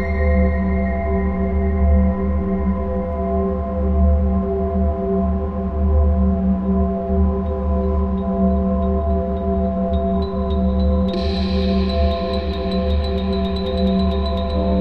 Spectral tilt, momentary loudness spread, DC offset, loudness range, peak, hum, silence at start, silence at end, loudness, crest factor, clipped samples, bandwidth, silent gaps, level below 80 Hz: -10 dB/octave; 4 LU; 1%; 1 LU; -4 dBFS; none; 0 s; 0 s; -20 LUFS; 12 dB; under 0.1%; 5.2 kHz; none; -22 dBFS